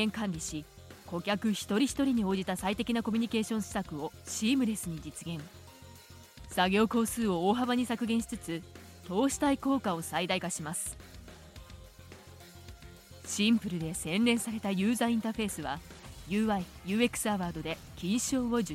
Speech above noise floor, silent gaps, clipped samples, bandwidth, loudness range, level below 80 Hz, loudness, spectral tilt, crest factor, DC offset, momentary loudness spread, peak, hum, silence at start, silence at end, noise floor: 21 dB; none; under 0.1%; 16.5 kHz; 5 LU; -56 dBFS; -31 LUFS; -4.5 dB/octave; 20 dB; under 0.1%; 22 LU; -12 dBFS; none; 0 s; 0 s; -52 dBFS